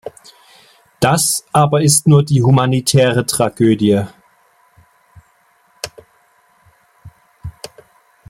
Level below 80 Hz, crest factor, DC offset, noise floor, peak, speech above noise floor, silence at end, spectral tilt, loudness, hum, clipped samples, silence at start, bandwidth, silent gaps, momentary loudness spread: -50 dBFS; 16 dB; under 0.1%; -55 dBFS; 0 dBFS; 43 dB; 0.8 s; -5 dB/octave; -13 LUFS; none; under 0.1%; 0.05 s; 16.5 kHz; none; 22 LU